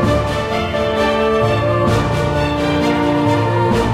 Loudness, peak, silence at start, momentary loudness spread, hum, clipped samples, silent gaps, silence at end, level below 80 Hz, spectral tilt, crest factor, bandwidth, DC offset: -16 LUFS; -2 dBFS; 0 s; 3 LU; none; under 0.1%; none; 0 s; -30 dBFS; -6.5 dB/octave; 12 dB; 15 kHz; under 0.1%